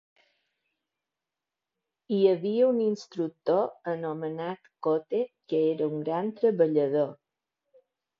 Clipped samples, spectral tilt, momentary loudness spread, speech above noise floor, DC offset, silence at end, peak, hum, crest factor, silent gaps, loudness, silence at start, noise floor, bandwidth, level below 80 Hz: under 0.1%; -8 dB/octave; 9 LU; 62 dB; under 0.1%; 1.05 s; -10 dBFS; none; 18 dB; none; -28 LUFS; 2.1 s; -89 dBFS; 7 kHz; -82 dBFS